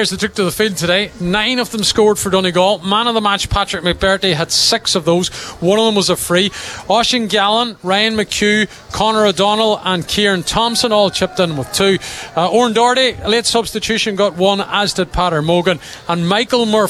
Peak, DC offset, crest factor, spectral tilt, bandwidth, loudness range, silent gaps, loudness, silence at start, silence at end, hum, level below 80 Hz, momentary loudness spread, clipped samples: -2 dBFS; under 0.1%; 14 dB; -3.5 dB/octave; 15 kHz; 1 LU; none; -14 LUFS; 0 s; 0 s; none; -38 dBFS; 5 LU; under 0.1%